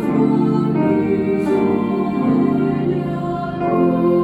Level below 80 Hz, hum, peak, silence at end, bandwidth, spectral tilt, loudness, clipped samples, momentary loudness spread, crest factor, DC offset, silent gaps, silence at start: -48 dBFS; none; -4 dBFS; 0 s; 11.5 kHz; -9.5 dB/octave; -18 LUFS; under 0.1%; 6 LU; 12 dB; under 0.1%; none; 0 s